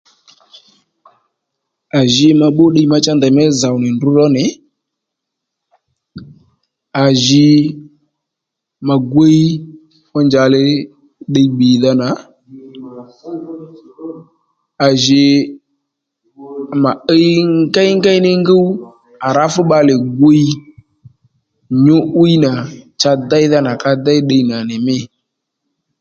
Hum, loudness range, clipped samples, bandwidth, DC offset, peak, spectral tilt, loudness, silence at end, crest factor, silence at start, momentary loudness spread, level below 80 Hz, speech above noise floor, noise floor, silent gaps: none; 5 LU; under 0.1%; 7.8 kHz; under 0.1%; 0 dBFS; -6 dB/octave; -12 LUFS; 0.95 s; 14 dB; 1.95 s; 19 LU; -54 dBFS; 68 dB; -79 dBFS; none